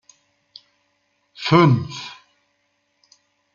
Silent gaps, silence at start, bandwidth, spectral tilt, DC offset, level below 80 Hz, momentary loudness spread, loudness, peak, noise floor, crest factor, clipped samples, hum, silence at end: none; 1.4 s; 7.4 kHz; -7 dB/octave; under 0.1%; -60 dBFS; 19 LU; -18 LUFS; -2 dBFS; -69 dBFS; 22 dB; under 0.1%; 50 Hz at -55 dBFS; 1.4 s